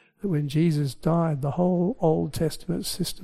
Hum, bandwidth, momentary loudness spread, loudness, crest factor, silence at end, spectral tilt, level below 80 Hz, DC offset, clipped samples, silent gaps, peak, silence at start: none; 15.5 kHz; 6 LU; -25 LUFS; 16 dB; 0 s; -7 dB/octave; -48 dBFS; under 0.1%; under 0.1%; none; -8 dBFS; 0.25 s